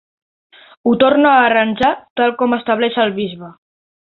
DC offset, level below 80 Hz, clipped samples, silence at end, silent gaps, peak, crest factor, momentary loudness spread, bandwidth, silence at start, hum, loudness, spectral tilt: under 0.1%; -54 dBFS; under 0.1%; 0.65 s; 2.10-2.16 s; -2 dBFS; 14 dB; 11 LU; 6.6 kHz; 0.85 s; none; -14 LUFS; -7 dB/octave